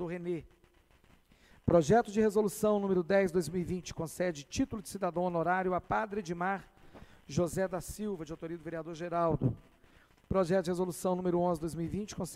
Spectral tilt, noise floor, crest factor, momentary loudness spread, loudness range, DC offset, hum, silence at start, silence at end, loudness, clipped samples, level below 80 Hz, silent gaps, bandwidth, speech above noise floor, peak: -6.5 dB/octave; -65 dBFS; 20 dB; 11 LU; 6 LU; under 0.1%; none; 0 s; 0 s; -33 LUFS; under 0.1%; -56 dBFS; none; 16 kHz; 33 dB; -14 dBFS